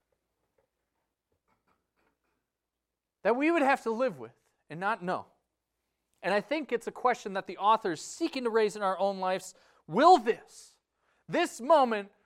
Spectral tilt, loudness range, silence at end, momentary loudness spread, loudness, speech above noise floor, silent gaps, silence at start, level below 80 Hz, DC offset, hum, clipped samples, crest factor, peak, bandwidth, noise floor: -4.5 dB/octave; 6 LU; 0.2 s; 12 LU; -29 LUFS; 59 dB; none; 3.25 s; -78 dBFS; under 0.1%; none; under 0.1%; 22 dB; -8 dBFS; 14.5 kHz; -88 dBFS